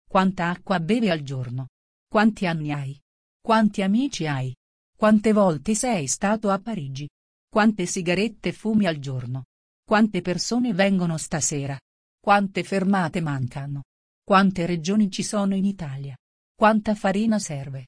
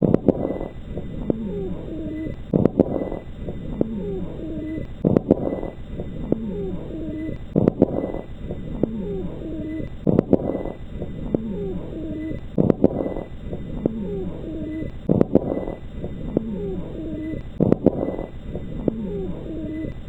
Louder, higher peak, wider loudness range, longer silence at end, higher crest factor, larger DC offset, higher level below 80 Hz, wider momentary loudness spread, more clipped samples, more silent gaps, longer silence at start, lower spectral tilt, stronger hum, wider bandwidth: about the same, -23 LUFS vs -25 LUFS; second, -6 dBFS vs 0 dBFS; about the same, 2 LU vs 2 LU; about the same, 0 s vs 0 s; second, 18 dB vs 24 dB; second, under 0.1% vs 0.2%; second, -54 dBFS vs -36 dBFS; about the same, 13 LU vs 14 LU; neither; first, 1.69-2.07 s, 3.02-3.40 s, 4.57-4.93 s, 7.10-7.48 s, 9.45-9.83 s, 11.81-12.18 s, 13.85-14.22 s, 16.19-16.55 s vs none; about the same, 0.1 s vs 0 s; second, -5 dB/octave vs -10.5 dB/octave; neither; first, 10.5 kHz vs 7.8 kHz